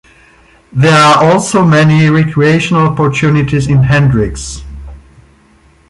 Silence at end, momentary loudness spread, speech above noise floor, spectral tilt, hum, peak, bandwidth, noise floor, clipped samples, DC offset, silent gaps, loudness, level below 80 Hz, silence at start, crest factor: 0.95 s; 14 LU; 37 dB; -6 dB/octave; none; 0 dBFS; 11.5 kHz; -46 dBFS; under 0.1%; under 0.1%; none; -9 LUFS; -32 dBFS; 0.75 s; 10 dB